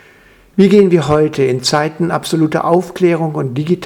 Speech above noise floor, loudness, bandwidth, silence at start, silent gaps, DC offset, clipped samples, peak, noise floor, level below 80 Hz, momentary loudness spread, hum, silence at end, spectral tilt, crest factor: 33 dB; -13 LUFS; 17 kHz; 0.55 s; none; under 0.1%; 0.1%; 0 dBFS; -45 dBFS; -46 dBFS; 8 LU; none; 0 s; -6 dB/octave; 14 dB